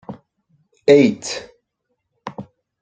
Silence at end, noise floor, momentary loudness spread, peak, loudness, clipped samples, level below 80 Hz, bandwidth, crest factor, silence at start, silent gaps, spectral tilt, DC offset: 0.4 s; -74 dBFS; 25 LU; 0 dBFS; -16 LUFS; under 0.1%; -62 dBFS; 9.4 kHz; 20 dB; 0.1 s; none; -5 dB/octave; under 0.1%